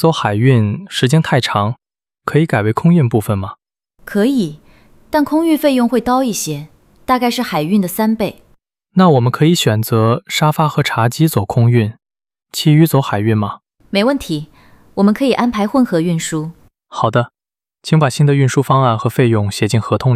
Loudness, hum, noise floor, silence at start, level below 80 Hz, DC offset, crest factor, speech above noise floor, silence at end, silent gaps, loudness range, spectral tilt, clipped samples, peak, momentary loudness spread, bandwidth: -15 LUFS; none; -57 dBFS; 0 s; -48 dBFS; under 0.1%; 14 dB; 43 dB; 0 s; none; 2 LU; -6 dB/octave; under 0.1%; 0 dBFS; 10 LU; 16 kHz